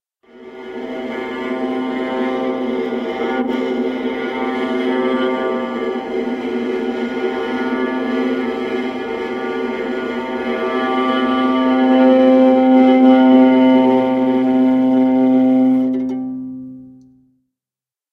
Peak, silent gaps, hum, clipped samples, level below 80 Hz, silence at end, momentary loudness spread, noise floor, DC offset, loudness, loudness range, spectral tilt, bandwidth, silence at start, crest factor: 0 dBFS; none; none; under 0.1%; -56 dBFS; 1.2 s; 12 LU; under -90 dBFS; under 0.1%; -16 LUFS; 9 LU; -6.5 dB/octave; 6 kHz; 0.35 s; 16 dB